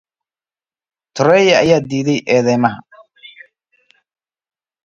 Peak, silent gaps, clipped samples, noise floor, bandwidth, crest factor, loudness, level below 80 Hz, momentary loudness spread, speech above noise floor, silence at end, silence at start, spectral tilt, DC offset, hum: 0 dBFS; none; under 0.1%; under -90 dBFS; 7.6 kHz; 18 dB; -13 LUFS; -56 dBFS; 10 LU; over 77 dB; 1.6 s; 1.15 s; -5.5 dB/octave; under 0.1%; none